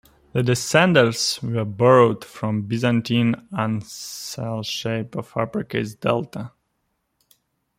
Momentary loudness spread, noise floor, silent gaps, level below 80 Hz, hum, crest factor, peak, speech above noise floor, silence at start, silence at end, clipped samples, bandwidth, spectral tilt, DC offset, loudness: 13 LU; -73 dBFS; none; -58 dBFS; none; 20 dB; -2 dBFS; 52 dB; 0.35 s; 1.3 s; under 0.1%; 16.5 kHz; -5 dB/octave; under 0.1%; -21 LUFS